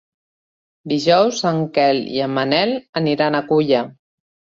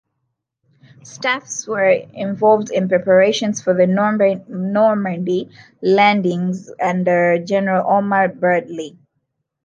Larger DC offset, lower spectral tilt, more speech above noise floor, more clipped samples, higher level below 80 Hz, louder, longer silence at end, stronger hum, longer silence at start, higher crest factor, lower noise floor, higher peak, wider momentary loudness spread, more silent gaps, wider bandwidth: neither; about the same, -5.5 dB/octave vs -5.5 dB/octave; first, over 73 dB vs 57 dB; neither; first, -60 dBFS vs -68 dBFS; about the same, -18 LUFS vs -17 LUFS; about the same, 0.65 s vs 0.75 s; neither; second, 0.85 s vs 1.05 s; about the same, 16 dB vs 16 dB; first, under -90 dBFS vs -74 dBFS; about the same, -2 dBFS vs -2 dBFS; second, 6 LU vs 10 LU; first, 2.89-2.93 s vs none; second, 7.8 kHz vs 9.4 kHz